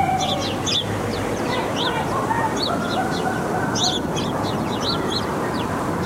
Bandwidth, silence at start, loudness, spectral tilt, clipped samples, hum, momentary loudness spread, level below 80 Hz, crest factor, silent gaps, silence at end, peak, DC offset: 16 kHz; 0 s; -22 LUFS; -4 dB/octave; under 0.1%; none; 4 LU; -44 dBFS; 14 dB; none; 0 s; -8 dBFS; under 0.1%